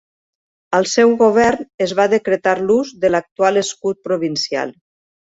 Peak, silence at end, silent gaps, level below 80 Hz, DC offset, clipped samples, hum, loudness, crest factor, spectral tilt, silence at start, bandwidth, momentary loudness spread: -2 dBFS; 0.55 s; 1.74-1.78 s, 3.31-3.36 s; -54 dBFS; under 0.1%; under 0.1%; none; -16 LUFS; 16 dB; -4 dB/octave; 0.7 s; 8 kHz; 9 LU